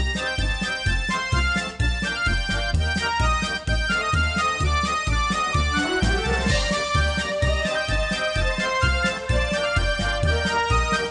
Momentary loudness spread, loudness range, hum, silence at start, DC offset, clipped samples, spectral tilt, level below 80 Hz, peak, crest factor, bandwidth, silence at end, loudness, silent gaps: 3 LU; 1 LU; none; 0 s; under 0.1%; under 0.1%; -4 dB/octave; -28 dBFS; -8 dBFS; 14 dB; 10.5 kHz; 0 s; -22 LUFS; none